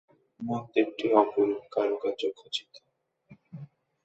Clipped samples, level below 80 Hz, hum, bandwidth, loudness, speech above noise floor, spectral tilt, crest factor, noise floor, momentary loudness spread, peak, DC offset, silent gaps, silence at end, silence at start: under 0.1%; -76 dBFS; none; 8.2 kHz; -28 LUFS; 33 dB; -6 dB/octave; 24 dB; -61 dBFS; 23 LU; -6 dBFS; under 0.1%; none; 0.4 s; 0.4 s